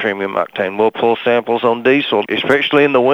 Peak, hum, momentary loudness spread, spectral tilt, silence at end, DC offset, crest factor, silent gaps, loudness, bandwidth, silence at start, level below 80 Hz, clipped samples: 0 dBFS; none; 7 LU; -6 dB/octave; 0 s; under 0.1%; 14 dB; none; -15 LUFS; 13.5 kHz; 0 s; -60 dBFS; under 0.1%